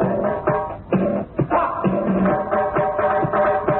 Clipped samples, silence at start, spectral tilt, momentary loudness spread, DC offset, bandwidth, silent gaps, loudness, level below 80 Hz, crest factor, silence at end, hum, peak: under 0.1%; 0 s; -13 dB/octave; 4 LU; under 0.1%; 4.1 kHz; none; -20 LUFS; -44 dBFS; 14 dB; 0 s; none; -6 dBFS